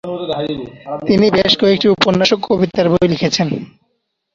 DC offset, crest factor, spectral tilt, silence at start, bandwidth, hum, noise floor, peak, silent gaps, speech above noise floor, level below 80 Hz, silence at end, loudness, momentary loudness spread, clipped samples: under 0.1%; 16 dB; -5.5 dB/octave; 0.05 s; 7.6 kHz; none; -69 dBFS; 0 dBFS; none; 54 dB; -46 dBFS; 0.65 s; -14 LUFS; 12 LU; under 0.1%